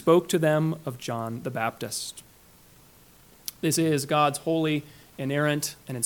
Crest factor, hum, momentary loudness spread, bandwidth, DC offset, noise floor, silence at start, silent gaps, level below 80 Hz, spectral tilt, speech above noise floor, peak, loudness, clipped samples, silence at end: 20 dB; none; 13 LU; 19 kHz; under 0.1%; -55 dBFS; 0 s; none; -64 dBFS; -5 dB/octave; 29 dB; -8 dBFS; -26 LUFS; under 0.1%; 0 s